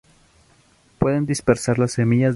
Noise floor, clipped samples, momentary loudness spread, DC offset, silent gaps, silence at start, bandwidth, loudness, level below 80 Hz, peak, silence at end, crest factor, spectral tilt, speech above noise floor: -56 dBFS; under 0.1%; 3 LU; under 0.1%; none; 1 s; 11.5 kHz; -20 LUFS; -46 dBFS; -2 dBFS; 0 s; 18 dB; -6.5 dB/octave; 38 dB